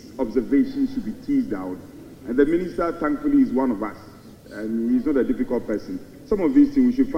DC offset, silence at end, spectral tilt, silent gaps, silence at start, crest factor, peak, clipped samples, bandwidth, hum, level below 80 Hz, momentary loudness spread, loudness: under 0.1%; 0 s; -8 dB/octave; none; 0.05 s; 18 dB; -4 dBFS; under 0.1%; 8.8 kHz; none; -44 dBFS; 16 LU; -22 LUFS